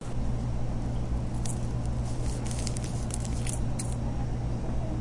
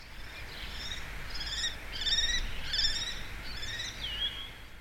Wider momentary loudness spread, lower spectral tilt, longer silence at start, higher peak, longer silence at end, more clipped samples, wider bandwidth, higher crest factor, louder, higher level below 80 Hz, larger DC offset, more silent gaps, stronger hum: second, 1 LU vs 14 LU; first, -6 dB/octave vs -1 dB/octave; about the same, 0 s vs 0 s; first, -10 dBFS vs -16 dBFS; about the same, 0 s vs 0 s; neither; second, 11.5 kHz vs 16.5 kHz; about the same, 18 dB vs 18 dB; about the same, -33 LUFS vs -33 LUFS; first, -34 dBFS vs -42 dBFS; neither; neither; neither